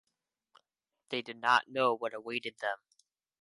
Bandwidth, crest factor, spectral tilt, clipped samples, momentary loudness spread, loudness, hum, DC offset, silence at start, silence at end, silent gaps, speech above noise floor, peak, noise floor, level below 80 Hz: 11.5 kHz; 24 dB; -3.5 dB/octave; under 0.1%; 11 LU; -32 LUFS; none; under 0.1%; 1.1 s; 0.65 s; none; 53 dB; -12 dBFS; -86 dBFS; -88 dBFS